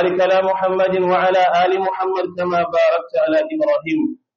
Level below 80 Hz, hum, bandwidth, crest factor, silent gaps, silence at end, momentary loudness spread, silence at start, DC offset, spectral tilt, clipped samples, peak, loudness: -64 dBFS; none; 7.2 kHz; 10 dB; none; 0.2 s; 6 LU; 0 s; under 0.1%; -3.5 dB/octave; under 0.1%; -6 dBFS; -17 LUFS